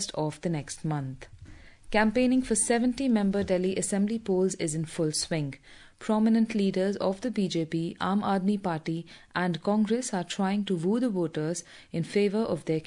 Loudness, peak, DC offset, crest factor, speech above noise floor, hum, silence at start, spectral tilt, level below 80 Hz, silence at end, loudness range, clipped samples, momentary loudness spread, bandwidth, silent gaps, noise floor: -28 LUFS; -10 dBFS; under 0.1%; 18 dB; 21 dB; none; 0 s; -5 dB/octave; -56 dBFS; 0 s; 3 LU; under 0.1%; 9 LU; 11 kHz; none; -49 dBFS